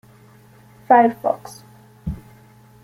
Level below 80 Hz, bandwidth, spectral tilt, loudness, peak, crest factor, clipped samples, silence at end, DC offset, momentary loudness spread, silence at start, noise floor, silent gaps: -46 dBFS; 15.5 kHz; -7 dB/octave; -17 LUFS; -2 dBFS; 20 dB; under 0.1%; 0.65 s; under 0.1%; 21 LU; 0.9 s; -49 dBFS; none